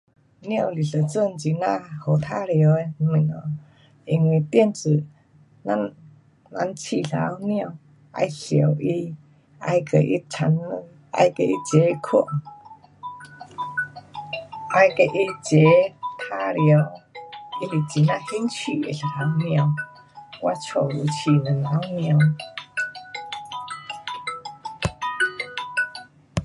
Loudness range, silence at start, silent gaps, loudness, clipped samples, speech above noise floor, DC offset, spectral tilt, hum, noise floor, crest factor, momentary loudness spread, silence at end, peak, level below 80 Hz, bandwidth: 6 LU; 0.4 s; none; -23 LUFS; under 0.1%; 30 dB; under 0.1%; -6.5 dB/octave; none; -51 dBFS; 20 dB; 16 LU; 0 s; -4 dBFS; -56 dBFS; 11 kHz